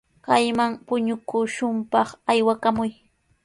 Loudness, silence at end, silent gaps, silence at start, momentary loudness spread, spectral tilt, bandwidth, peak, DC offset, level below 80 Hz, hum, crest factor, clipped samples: -23 LUFS; 0.55 s; none; 0.25 s; 6 LU; -4.5 dB/octave; 11.5 kHz; -4 dBFS; under 0.1%; -60 dBFS; none; 18 dB; under 0.1%